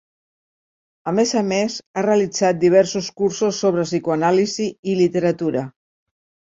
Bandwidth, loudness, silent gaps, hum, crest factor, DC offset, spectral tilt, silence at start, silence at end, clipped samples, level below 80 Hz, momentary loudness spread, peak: 7.8 kHz; -19 LUFS; 1.86-1.94 s, 4.79-4.83 s; none; 16 dB; under 0.1%; -5 dB/octave; 1.05 s; 0.85 s; under 0.1%; -62 dBFS; 8 LU; -2 dBFS